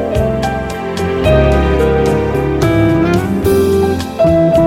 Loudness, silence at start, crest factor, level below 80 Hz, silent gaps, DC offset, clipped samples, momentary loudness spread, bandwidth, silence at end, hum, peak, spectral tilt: -13 LUFS; 0 s; 12 dB; -22 dBFS; none; 0.3%; under 0.1%; 6 LU; 17 kHz; 0 s; none; 0 dBFS; -7 dB/octave